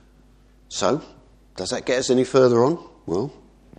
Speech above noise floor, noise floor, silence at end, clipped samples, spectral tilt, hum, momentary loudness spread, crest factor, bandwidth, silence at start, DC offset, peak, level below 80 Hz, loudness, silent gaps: 33 dB; -53 dBFS; 0.5 s; under 0.1%; -5 dB/octave; none; 15 LU; 18 dB; 10 kHz; 0.7 s; under 0.1%; -4 dBFS; -54 dBFS; -22 LUFS; none